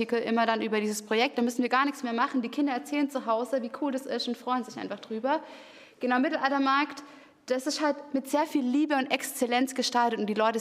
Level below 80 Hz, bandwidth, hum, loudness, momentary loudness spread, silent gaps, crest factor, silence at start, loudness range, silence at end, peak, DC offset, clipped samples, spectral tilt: -80 dBFS; 15.5 kHz; none; -28 LUFS; 7 LU; none; 20 dB; 0 s; 3 LU; 0 s; -8 dBFS; under 0.1%; under 0.1%; -3.5 dB/octave